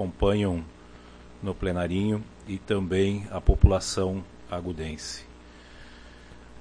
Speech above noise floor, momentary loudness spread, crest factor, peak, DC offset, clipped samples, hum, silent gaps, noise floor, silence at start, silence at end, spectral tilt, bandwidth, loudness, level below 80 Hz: 22 dB; 26 LU; 24 dB; -2 dBFS; under 0.1%; under 0.1%; 60 Hz at -45 dBFS; none; -48 dBFS; 0 s; 0 s; -6 dB/octave; 10.5 kHz; -28 LUFS; -34 dBFS